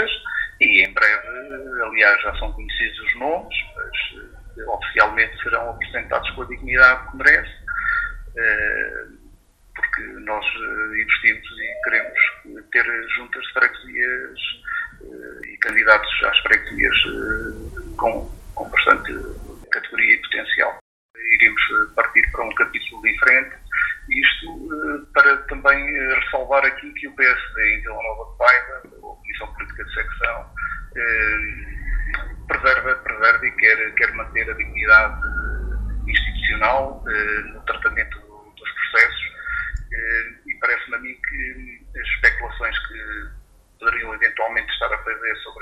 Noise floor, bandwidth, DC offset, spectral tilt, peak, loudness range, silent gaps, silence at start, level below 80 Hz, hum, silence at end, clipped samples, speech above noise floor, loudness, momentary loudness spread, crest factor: -50 dBFS; 13.5 kHz; under 0.1%; -4.5 dB/octave; 0 dBFS; 5 LU; 20.81-21.14 s; 0 s; -36 dBFS; none; 0 s; under 0.1%; 29 dB; -19 LUFS; 16 LU; 20 dB